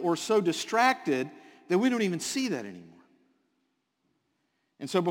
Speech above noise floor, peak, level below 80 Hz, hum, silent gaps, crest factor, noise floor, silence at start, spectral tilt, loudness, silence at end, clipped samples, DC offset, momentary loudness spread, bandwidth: 49 dB; -10 dBFS; -78 dBFS; none; none; 20 dB; -77 dBFS; 0 s; -4.5 dB/octave; -28 LUFS; 0 s; under 0.1%; under 0.1%; 12 LU; 17 kHz